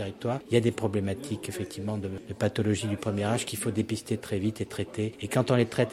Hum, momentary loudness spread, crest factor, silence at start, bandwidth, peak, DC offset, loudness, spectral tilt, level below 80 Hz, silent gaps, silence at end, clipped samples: none; 9 LU; 20 dB; 0 s; 16 kHz; -8 dBFS; under 0.1%; -30 LUFS; -6 dB/octave; -60 dBFS; none; 0 s; under 0.1%